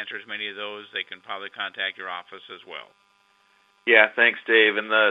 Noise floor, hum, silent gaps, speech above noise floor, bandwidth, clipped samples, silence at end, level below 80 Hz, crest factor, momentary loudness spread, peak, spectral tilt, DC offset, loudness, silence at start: -63 dBFS; none; none; 39 dB; 5.2 kHz; under 0.1%; 0 s; -86 dBFS; 24 dB; 21 LU; 0 dBFS; -4.5 dB/octave; under 0.1%; -21 LUFS; 0 s